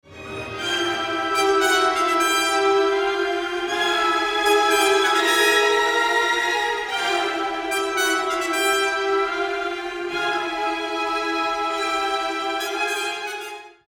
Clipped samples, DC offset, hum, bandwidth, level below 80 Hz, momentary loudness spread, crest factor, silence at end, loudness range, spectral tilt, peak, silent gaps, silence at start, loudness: under 0.1%; under 0.1%; none; 19.5 kHz; -56 dBFS; 8 LU; 16 dB; 0.2 s; 5 LU; -1 dB/octave; -6 dBFS; none; 0.1 s; -20 LUFS